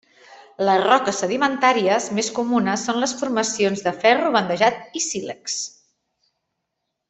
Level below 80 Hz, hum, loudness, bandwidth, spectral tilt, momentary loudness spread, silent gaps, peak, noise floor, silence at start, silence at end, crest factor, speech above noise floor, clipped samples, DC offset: -66 dBFS; none; -20 LUFS; 8.4 kHz; -3 dB/octave; 9 LU; none; -2 dBFS; -78 dBFS; 0.3 s; 1.4 s; 20 dB; 58 dB; under 0.1%; under 0.1%